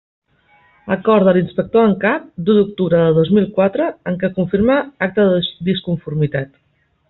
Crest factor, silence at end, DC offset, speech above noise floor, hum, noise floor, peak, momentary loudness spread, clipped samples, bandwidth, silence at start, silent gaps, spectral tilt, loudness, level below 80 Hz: 14 dB; 0.65 s; under 0.1%; 39 dB; none; -54 dBFS; -2 dBFS; 8 LU; under 0.1%; 4.2 kHz; 0.85 s; none; -6 dB/octave; -16 LUFS; -48 dBFS